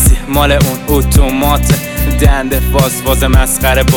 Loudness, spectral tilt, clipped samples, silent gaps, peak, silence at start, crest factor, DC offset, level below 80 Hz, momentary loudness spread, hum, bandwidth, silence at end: -11 LUFS; -4.5 dB/octave; under 0.1%; none; 0 dBFS; 0 s; 10 dB; under 0.1%; -14 dBFS; 3 LU; none; 19.5 kHz; 0 s